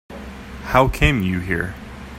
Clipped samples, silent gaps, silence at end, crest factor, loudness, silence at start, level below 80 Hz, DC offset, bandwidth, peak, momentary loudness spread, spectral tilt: under 0.1%; none; 0 s; 20 dB; -19 LUFS; 0.1 s; -30 dBFS; under 0.1%; 16 kHz; 0 dBFS; 19 LU; -6 dB/octave